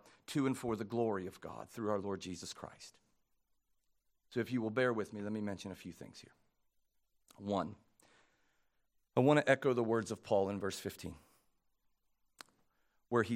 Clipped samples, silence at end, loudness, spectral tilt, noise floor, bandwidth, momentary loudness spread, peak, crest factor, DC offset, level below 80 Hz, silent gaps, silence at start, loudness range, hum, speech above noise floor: under 0.1%; 0 s; -37 LUFS; -6 dB/octave; -79 dBFS; 16 kHz; 18 LU; -14 dBFS; 24 dB; under 0.1%; -76 dBFS; none; 0.3 s; 10 LU; none; 42 dB